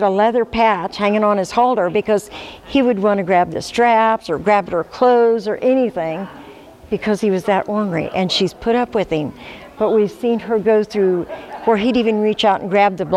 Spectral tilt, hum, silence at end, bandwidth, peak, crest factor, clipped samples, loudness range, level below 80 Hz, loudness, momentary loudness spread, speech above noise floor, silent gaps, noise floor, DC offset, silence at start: -5.5 dB/octave; none; 0 s; 13 kHz; -2 dBFS; 14 dB; under 0.1%; 3 LU; -48 dBFS; -17 LUFS; 8 LU; 23 dB; none; -39 dBFS; under 0.1%; 0 s